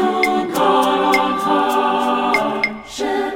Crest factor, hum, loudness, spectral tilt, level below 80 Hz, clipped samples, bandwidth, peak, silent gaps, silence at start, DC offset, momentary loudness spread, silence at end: 16 dB; none; -17 LUFS; -4 dB/octave; -50 dBFS; under 0.1%; 18 kHz; -2 dBFS; none; 0 s; under 0.1%; 6 LU; 0 s